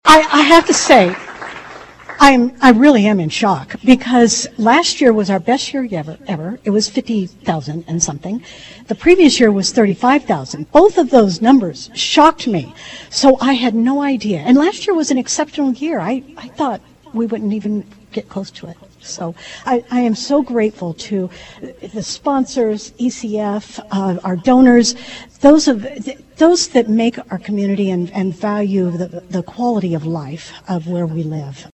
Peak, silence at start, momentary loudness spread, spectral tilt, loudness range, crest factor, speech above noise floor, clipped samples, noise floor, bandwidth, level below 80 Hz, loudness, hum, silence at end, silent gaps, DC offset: 0 dBFS; 0.05 s; 18 LU; -4.5 dB/octave; 8 LU; 14 dB; 21 dB; 0.2%; -36 dBFS; 12.5 kHz; -46 dBFS; -14 LUFS; none; 0.1 s; none; under 0.1%